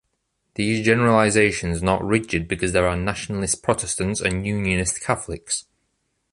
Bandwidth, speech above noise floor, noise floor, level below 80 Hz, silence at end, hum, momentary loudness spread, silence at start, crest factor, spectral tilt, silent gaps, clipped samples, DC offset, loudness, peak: 11.5 kHz; 52 dB; -73 dBFS; -40 dBFS; 0.7 s; none; 10 LU; 0.6 s; 20 dB; -4.5 dB/octave; none; under 0.1%; under 0.1%; -21 LUFS; -2 dBFS